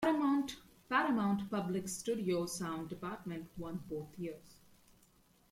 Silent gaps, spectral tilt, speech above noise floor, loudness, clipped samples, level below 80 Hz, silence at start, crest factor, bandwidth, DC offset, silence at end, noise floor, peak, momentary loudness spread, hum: none; -5 dB/octave; 31 dB; -37 LUFS; under 0.1%; -68 dBFS; 0 s; 18 dB; 16.5 kHz; under 0.1%; 1 s; -68 dBFS; -18 dBFS; 13 LU; none